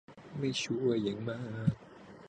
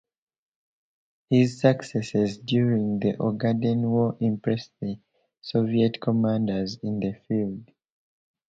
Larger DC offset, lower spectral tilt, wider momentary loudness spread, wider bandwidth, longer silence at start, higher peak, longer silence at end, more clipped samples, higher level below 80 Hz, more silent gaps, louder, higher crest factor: neither; second, -6 dB/octave vs -7.5 dB/octave; first, 15 LU vs 9 LU; first, 9.8 kHz vs 7.8 kHz; second, 0.1 s vs 1.3 s; second, -16 dBFS vs -4 dBFS; second, 0 s vs 0.85 s; neither; about the same, -64 dBFS vs -62 dBFS; neither; second, -34 LUFS vs -25 LUFS; about the same, 20 dB vs 20 dB